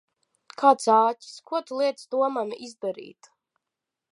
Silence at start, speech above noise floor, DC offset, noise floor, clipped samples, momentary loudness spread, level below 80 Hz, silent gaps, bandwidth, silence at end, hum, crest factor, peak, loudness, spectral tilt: 0.6 s; 62 dB; under 0.1%; -86 dBFS; under 0.1%; 16 LU; -86 dBFS; none; 11.5 kHz; 1 s; none; 22 dB; -4 dBFS; -24 LUFS; -3.5 dB/octave